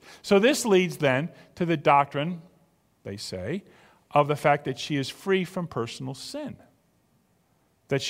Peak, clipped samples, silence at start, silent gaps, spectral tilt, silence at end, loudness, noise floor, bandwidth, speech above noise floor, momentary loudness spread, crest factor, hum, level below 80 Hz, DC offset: -4 dBFS; under 0.1%; 0.05 s; none; -5 dB/octave; 0 s; -26 LUFS; -67 dBFS; 16 kHz; 42 dB; 16 LU; 22 dB; none; -64 dBFS; under 0.1%